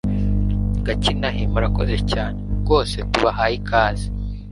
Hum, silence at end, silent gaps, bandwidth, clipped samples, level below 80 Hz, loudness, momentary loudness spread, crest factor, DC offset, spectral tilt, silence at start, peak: 50 Hz at -25 dBFS; 0 s; none; 11.5 kHz; under 0.1%; -24 dBFS; -21 LUFS; 7 LU; 18 dB; under 0.1%; -6 dB/octave; 0.05 s; 0 dBFS